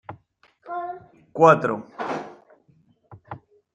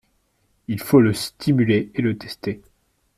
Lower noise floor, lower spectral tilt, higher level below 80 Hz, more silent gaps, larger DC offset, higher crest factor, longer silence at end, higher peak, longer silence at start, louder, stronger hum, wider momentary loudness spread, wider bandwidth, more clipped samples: second, -61 dBFS vs -66 dBFS; about the same, -7 dB/octave vs -6.5 dB/octave; second, -70 dBFS vs -54 dBFS; neither; neither; first, 24 dB vs 18 dB; second, 0.4 s vs 0.6 s; about the same, -2 dBFS vs -4 dBFS; second, 0.1 s vs 0.7 s; about the same, -22 LUFS vs -21 LUFS; neither; first, 26 LU vs 14 LU; second, 9.2 kHz vs 16 kHz; neither